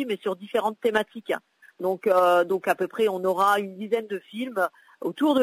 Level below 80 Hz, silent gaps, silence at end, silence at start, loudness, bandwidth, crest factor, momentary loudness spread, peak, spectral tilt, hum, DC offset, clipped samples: -74 dBFS; none; 0 s; 0 s; -25 LUFS; 16 kHz; 14 dB; 11 LU; -10 dBFS; -5 dB/octave; none; under 0.1%; under 0.1%